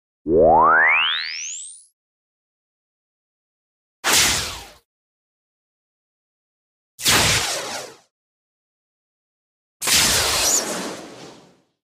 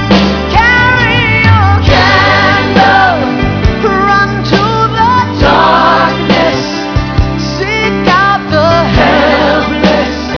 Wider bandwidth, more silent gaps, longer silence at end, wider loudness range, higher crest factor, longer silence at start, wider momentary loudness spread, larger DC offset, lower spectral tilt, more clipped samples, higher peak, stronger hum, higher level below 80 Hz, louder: first, 16 kHz vs 5.4 kHz; first, 1.93-4.03 s, 4.85-6.98 s, 8.11-9.80 s vs none; first, 0.55 s vs 0 s; about the same, 4 LU vs 3 LU; first, 18 dB vs 8 dB; first, 0.25 s vs 0 s; first, 18 LU vs 6 LU; neither; second, -1 dB/octave vs -6 dB/octave; second, under 0.1% vs 1%; second, -4 dBFS vs 0 dBFS; neither; second, -46 dBFS vs -22 dBFS; second, -17 LUFS vs -8 LUFS